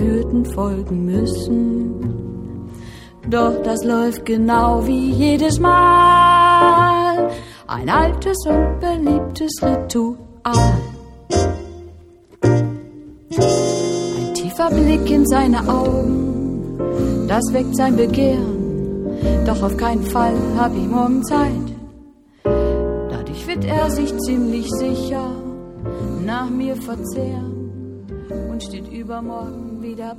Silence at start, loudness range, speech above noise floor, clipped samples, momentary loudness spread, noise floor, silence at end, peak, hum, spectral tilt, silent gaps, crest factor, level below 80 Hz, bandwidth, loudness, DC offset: 0 s; 10 LU; 28 dB; under 0.1%; 16 LU; -45 dBFS; 0 s; -2 dBFS; none; -6 dB/octave; none; 16 dB; -30 dBFS; 16 kHz; -17 LUFS; under 0.1%